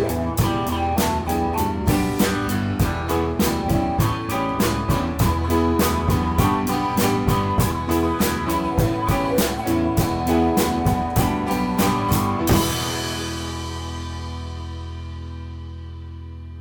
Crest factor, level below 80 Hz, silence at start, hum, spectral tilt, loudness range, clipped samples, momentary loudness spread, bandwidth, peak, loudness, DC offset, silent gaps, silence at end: 16 dB; -32 dBFS; 0 s; none; -5.5 dB/octave; 5 LU; under 0.1%; 13 LU; 18 kHz; -4 dBFS; -21 LUFS; under 0.1%; none; 0 s